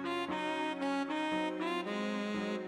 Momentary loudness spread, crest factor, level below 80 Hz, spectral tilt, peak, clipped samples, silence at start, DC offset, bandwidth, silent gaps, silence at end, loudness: 2 LU; 12 dB; -74 dBFS; -5 dB/octave; -24 dBFS; under 0.1%; 0 s; under 0.1%; 12.5 kHz; none; 0 s; -36 LUFS